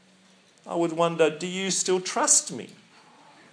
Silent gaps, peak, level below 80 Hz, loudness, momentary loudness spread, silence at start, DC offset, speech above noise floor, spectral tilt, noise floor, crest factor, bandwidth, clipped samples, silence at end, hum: none; -6 dBFS; -86 dBFS; -23 LUFS; 16 LU; 0.65 s; under 0.1%; 33 dB; -2.5 dB/octave; -58 dBFS; 22 dB; 10.5 kHz; under 0.1%; 0.8 s; none